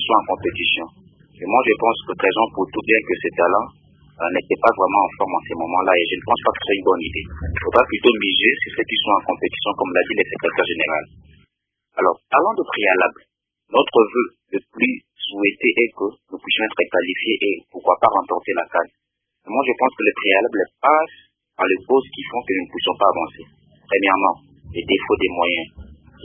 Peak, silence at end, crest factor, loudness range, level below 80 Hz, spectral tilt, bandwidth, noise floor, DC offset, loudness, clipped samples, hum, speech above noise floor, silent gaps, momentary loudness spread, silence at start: 0 dBFS; 0.3 s; 20 dB; 2 LU; -46 dBFS; -7.5 dB/octave; 4.5 kHz; -72 dBFS; under 0.1%; -19 LUFS; under 0.1%; none; 53 dB; none; 10 LU; 0 s